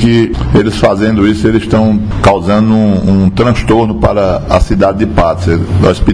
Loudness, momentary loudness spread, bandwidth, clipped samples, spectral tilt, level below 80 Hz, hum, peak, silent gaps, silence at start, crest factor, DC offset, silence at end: -10 LUFS; 2 LU; 10.5 kHz; 1%; -7.5 dB/octave; -20 dBFS; none; 0 dBFS; none; 0 s; 8 dB; 0.9%; 0 s